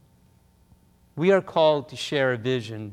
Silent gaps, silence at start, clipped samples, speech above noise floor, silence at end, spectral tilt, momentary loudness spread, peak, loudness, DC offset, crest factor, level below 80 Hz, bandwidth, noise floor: none; 1.15 s; under 0.1%; 36 dB; 0 s; -5.5 dB/octave; 8 LU; -8 dBFS; -23 LUFS; under 0.1%; 18 dB; -64 dBFS; 12 kHz; -59 dBFS